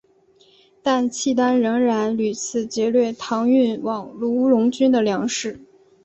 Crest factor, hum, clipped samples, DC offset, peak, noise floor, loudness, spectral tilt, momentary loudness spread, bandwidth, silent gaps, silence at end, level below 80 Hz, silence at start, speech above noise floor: 14 dB; none; under 0.1%; under 0.1%; -6 dBFS; -56 dBFS; -20 LUFS; -4.5 dB/octave; 8 LU; 8.2 kHz; none; 0.4 s; -64 dBFS; 0.85 s; 37 dB